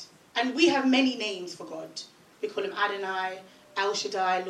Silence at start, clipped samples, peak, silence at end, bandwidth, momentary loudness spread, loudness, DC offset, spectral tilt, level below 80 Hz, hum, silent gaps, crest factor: 0 s; under 0.1%; -10 dBFS; 0 s; 11.5 kHz; 16 LU; -28 LUFS; under 0.1%; -2.5 dB/octave; -84 dBFS; none; none; 20 dB